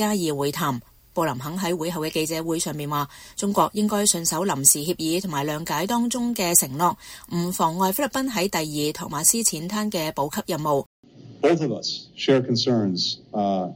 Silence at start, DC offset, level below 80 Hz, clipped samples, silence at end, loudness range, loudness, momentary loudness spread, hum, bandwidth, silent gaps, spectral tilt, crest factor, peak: 0 s; under 0.1%; -56 dBFS; under 0.1%; 0 s; 4 LU; -23 LUFS; 9 LU; none; 16.5 kHz; 10.86-11.03 s; -3.5 dB/octave; 22 dB; -2 dBFS